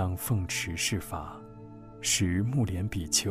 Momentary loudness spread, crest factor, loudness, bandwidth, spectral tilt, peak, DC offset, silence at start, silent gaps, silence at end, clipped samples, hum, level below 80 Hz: 20 LU; 18 dB; -29 LUFS; 15.5 kHz; -3.5 dB/octave; -12 dBFS; under 0.1%; 0 s; none; 0 s; under 0.1%; none; -48 dBFS